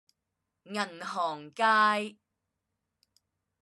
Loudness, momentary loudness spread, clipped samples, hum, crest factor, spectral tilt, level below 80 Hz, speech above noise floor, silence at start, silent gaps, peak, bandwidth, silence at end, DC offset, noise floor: -29 LUFS; 13 LU; under 0.1%; none; 20 dB; -3.5 dB/octave; -90 dBFS; 56 dB; 0.7 s; none; -12 dBFS; 12.5 kHz; 1.5 s; under 0.1%; -85 dBFS